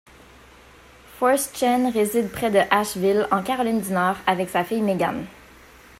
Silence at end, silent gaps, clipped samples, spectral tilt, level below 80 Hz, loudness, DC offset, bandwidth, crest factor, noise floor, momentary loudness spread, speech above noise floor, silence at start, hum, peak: 0.7 s; none; under 0.1%; -4.5 dB/octave; -54 dBFS; -22 LUFS; under 0.1%; 16 kHz; 20 dB; -49 dBFS; 4 LU; 27 dB; 1.1 s; none; -4 dBFS